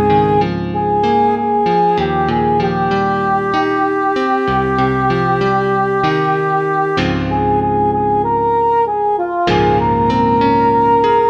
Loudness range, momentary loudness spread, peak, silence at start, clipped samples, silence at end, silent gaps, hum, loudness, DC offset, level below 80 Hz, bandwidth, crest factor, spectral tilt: 1 LU; 3 LU; -2 dBFS; 0 s; under 0.1%; 0 s; none; none; -15 LUFS; under 0.1%; -36 dBFS; 7.6 kHz; 12 dB; -7.5 dB/octave